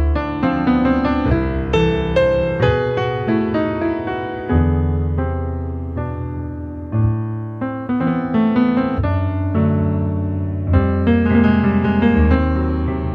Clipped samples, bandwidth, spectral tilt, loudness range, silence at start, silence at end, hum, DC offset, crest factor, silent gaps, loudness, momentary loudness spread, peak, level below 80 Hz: under 0.1%; 6.4 kHz; -9.5 dB/octave; 5 LU; 0 s; 0 s; none; under 0.1%; 14 dB; none; -18 LUFS; 10 LU; -2 dBFS; -26 dBFS